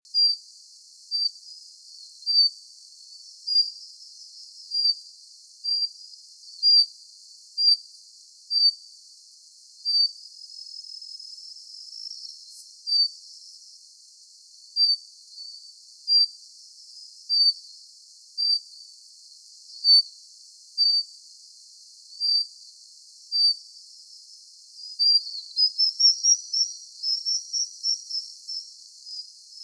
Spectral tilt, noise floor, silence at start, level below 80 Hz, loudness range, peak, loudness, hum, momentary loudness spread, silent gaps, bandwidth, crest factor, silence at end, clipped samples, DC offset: 11 dB/octave; -51 dBFS; 0.15 s; under -90 dBFS; 8 LU; -10 dBFS; -21 LUFS; none; 25 LU; none; 11 kHz; 18 dB; 0 s; under 0.1%; under 0.1%